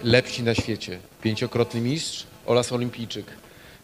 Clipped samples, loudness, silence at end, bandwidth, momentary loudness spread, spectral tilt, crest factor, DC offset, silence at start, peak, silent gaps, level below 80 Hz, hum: under 0.1%; -26 LUFS; 0.05 s; 15.5 kHz; 13 LU; -5 dB/octave; 24 dB; under 0.1%; 0 s; -2 dBFS; none; -52 dBFS; none